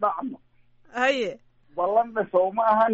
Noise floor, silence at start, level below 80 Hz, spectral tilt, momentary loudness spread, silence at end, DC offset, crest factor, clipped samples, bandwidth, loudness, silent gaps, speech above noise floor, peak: -57 dBFS; 0 s; -66 dBFS; -2 dB/octave; 15 LU; 0 s; under 0.1%; 16 dB; under 0.1%; 7.8 kHz; -24 LUFS; none; 34 dB; -8 dBFS